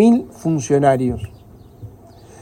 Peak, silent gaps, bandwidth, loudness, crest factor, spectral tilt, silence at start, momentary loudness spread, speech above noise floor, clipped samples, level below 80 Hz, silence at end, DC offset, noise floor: -2 dBFS; none; 14 kHz; -18 LUFS; 16 dB; -7 dB/octave; 0 s; 25 LU; 27 dB; under 0.1%; -46 dBFS; 0.55 s; under 0.1%; -42 dBFS